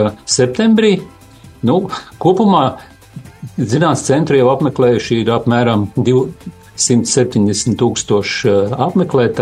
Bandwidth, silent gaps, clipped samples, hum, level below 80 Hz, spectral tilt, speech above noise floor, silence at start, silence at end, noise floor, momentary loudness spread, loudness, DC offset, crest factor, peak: 12.5 kHz; none; under 0.1%; none; -48 dBFS; -5 dB/octave; 22 dB; 0 s; 0 s; -35 dBFS; 9 LU; -14 LUFS; under 0.1%; 14 dB; 0 dBFS